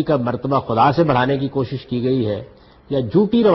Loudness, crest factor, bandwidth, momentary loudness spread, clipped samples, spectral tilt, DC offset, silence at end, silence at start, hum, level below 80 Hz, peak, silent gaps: -19 LUFS; 14 dB; 6 kHz; 9 LU; under 0.1%; -9.5 dB/octave; under 0.1%; 0 s; 0 s; none; -48 dBFS; -4 dBFS; none